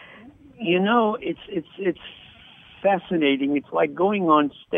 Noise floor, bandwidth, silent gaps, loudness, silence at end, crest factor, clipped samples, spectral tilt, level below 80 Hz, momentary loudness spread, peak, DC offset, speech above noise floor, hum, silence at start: -48 dBFS; 3.8 kHz; none; -22 LUFS; 0 s; 18 dB; under 0.1%; -8.5 dB/octave; -62 dBFS; 12 LU; -6 dBFS; under 0.1%; 26 dB; none; 0 s